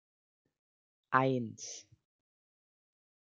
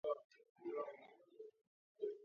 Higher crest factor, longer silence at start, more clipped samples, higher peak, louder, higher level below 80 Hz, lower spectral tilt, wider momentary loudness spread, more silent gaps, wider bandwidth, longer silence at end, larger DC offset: first, 28 dB vs 20 dB; first, 1.1 s vs 0.05 s; neither; first, -10 dBFS vs -30 dBFS; first, -33 LUFS vs -49 LUFS; first, -82 dBFS vs under -90 dBFS; first, -5 dB/octave vs -3.5 dB/octave; about the same, 15 LU vs 15 LU; second, none vs 0.24-0.30 s, 0.50-0.55 s, 1.67-1.95 s; first, 7.8 kHz vs 6.6 kHz; first, 1.55 s vs 0 s; neither